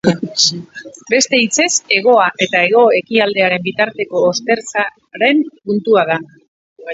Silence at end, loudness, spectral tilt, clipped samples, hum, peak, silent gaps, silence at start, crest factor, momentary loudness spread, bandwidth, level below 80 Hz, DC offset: 0 s; -14 LUFS; -3 dB/octave; under 0.1%; none; 0 dBFS; 6.48-6.76 s; 0.05 s; 14 dB; 8 LU; 8 kHz; -60 dBFS; under 0.1%